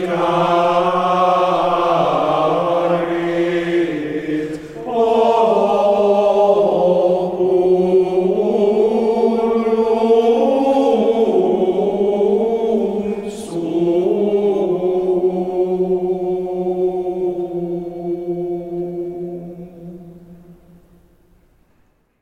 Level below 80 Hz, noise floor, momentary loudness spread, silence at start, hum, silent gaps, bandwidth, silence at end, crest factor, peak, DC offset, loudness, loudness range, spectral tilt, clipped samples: -52 dBFS; -58 dBFS; 11 LU; 0 s; none; none; 10.5 kHz; 1.7 s; 14 dB; -2 dBFS; under 0.1%; -17 LUFS; 11 LU; -7 dB/octave; under 0.1%